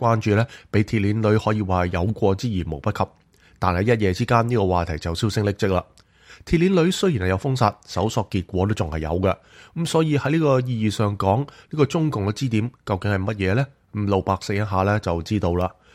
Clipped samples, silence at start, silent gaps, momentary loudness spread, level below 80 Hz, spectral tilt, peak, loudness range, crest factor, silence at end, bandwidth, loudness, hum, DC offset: under 0.1%; 0 s; none; 7 LU; -42 dBFS; -6.5 dB/octave; -4 dBFS; 1 LU; 18 dB; 0.25 s; 14.5 kHz; -22 LUFS; none; under 0.1%